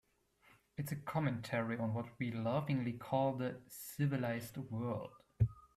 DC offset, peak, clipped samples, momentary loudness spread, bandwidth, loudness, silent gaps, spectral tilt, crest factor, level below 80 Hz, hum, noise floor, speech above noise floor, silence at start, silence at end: under 0.1%; -20 dBFS; under 0.1%; 9 LU; 15.5 kHz; -39 LUFS; none; -7 dB/octave; 18 dB; -60 dBFS; none; -71 dBFS; 32 dB; 0.8 s; 0.1 s